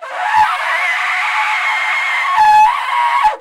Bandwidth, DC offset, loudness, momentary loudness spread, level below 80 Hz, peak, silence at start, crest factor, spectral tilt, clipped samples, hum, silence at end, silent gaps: 15.5 kHz; under 0.1%; -13 LUFS; 5 LU; -52 dBFS; -4 dBFS; 0 s; 10 dB; 0.5 dB/octave; under 0.1%; none; 0 s; none